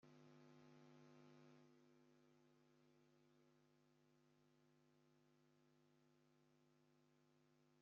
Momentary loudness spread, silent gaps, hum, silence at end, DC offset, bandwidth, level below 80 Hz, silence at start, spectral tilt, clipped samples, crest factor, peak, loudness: 0 LU; none; none; 0 s; under 0.1%; 6.8 kHz; under -90 dBFS; 0 s; -5.5 dB/octave; under 0.1%; 16 dB; -56 dBFS; -69 LUFS